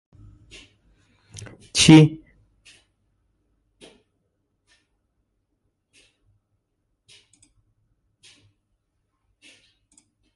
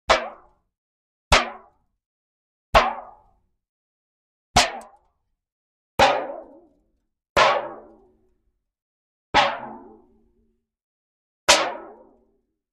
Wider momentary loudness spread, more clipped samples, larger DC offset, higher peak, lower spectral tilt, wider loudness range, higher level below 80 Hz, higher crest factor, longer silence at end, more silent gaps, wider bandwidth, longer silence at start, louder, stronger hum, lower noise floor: first, 30 LU vs 19 LU; neither; neither; about the same, 0 dBFS vs -2 dBFS; first, -5 dB/octave vs -2 dB/octave; second, 0 LU vs 4 LU; second, -56 dBFS vs -42 dBFS; about the same, 26 dB vs 24 dB; first, 8.2 s vs 0.8 s; second, none vs 0.78-1.31 s, 2.06-2.73 s, 3.69-4.54 s, 5.52-5.98 s, 7.30-7.36 s, 8.82-9.33 s, 10.82-11.47 s; second, 11.5 kHz vs 13 kHz; first, 1.75 s vs 0.1 s; first, -15 LUFS vs -20 LUFS; neither; first, -75 dBFS vs -71 dBFS